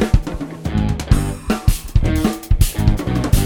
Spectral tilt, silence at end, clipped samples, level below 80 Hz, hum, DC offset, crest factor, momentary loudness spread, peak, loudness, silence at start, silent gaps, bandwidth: -6 dB/octave; 0 s; under 0.1%; -20 dBFS; none; 0.1%; 16 dB; 5 LU; -2 dBFS; -19 LUFS; 0 s; none; 19.5 kHz